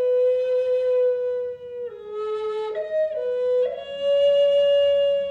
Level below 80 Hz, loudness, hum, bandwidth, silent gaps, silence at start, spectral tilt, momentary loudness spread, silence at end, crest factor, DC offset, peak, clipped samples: -64 dBFS; -22 LUFS; none; 7.2 kHz; none; 0 s; -3.5 dB/octave; 13 LU; 0 s; 10 dB; under 0.1%; -12 dBFS; under 0.1%